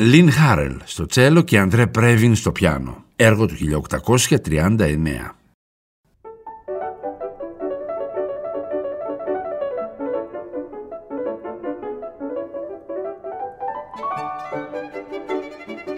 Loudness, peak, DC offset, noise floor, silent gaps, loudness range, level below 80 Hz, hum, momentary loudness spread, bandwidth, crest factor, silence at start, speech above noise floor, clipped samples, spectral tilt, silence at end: -20 LUFS; 0 dBFS; under 0.1%; -39 dBFS; 5.54-6.04 s; 13 LU; -40 dBFS; none; 17 LU; 16 kHz; 20 dB; 0 s; 24 dB; under 0.1%; -5.5 dB/octave; 0 s